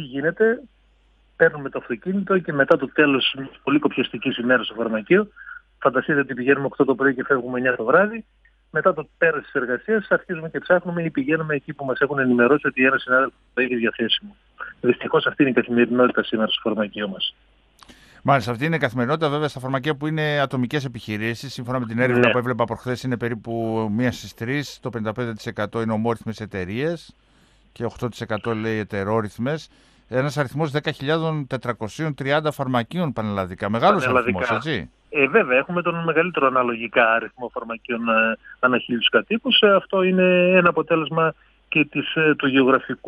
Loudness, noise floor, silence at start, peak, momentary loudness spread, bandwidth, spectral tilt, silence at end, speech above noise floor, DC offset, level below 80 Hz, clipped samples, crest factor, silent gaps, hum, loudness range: -21 LUFS; -58 dBFS; 0 s; -2 dBFS; 10 LU; 13.5 kHz; -6.5 dB/octave; 0.1 s; 37 dB; under 0.1%; -58 dBFS; under 0.1%; 20 dB; none; none; 7 LU